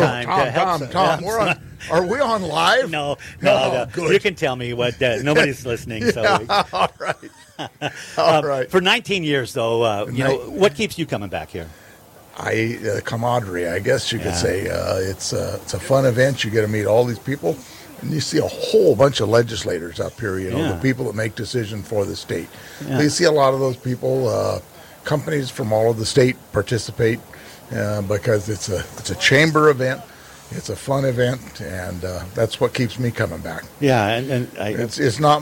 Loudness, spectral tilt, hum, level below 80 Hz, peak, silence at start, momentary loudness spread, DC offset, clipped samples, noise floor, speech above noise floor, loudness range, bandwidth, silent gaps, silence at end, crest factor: -20 LUFS; -5 dB/octave; none; -48 dBFS; -4 dBFS; 0 s; 12 LU; under 0.1%; under 0.1%; -45 dBFS; 26 dB; 4 LU; 17 kHz; none; 0 s; 16 dB